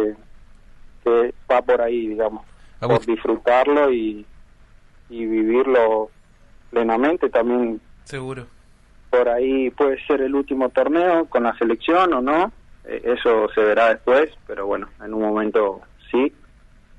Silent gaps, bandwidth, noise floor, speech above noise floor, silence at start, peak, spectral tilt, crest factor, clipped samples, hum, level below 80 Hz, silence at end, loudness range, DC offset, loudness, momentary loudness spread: none; 9.8 kHz; -49 dBFS; 31 dB; 0 s; -4 dBFS; -7 dB/octave; 16 dB; under 0.1%; none; -48 dBFS; 0.7 s; 3 LU; under 0.1%; -20 LUFS; 13 LU